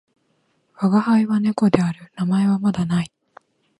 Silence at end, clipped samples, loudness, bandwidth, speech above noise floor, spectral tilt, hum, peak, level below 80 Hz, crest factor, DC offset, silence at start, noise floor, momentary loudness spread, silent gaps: 0.75 s; under 0.1%; -20 LUFS; 11.5 kHz; 48 dB; -8 dB/octave; none; 0 dBFS; -56 dBFS; 20 dB; under 0.1%; 0.8 s; -66 dBFS; 8 LU; none